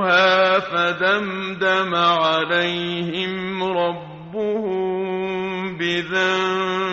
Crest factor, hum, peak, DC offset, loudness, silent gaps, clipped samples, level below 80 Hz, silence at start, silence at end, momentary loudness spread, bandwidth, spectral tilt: 16 dB; none; -4 dBFS; under 0.1%; -20 LUFS; none; under 0.1%; -60 dBFS; 0 s; 0 s; 8 LU; 7.6 kHz; -2 dB/octave